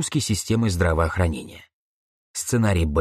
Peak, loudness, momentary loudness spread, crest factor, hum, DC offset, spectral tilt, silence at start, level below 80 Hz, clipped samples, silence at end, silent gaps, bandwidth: -6 dBFS; -22 LUFS; 13 LU; 18 dB; none; under 0.1%; -5 dB/octave; 0 s; -34 dBFS; under 0.1%; 0 s; 1.73-2.34 s; 13 kHz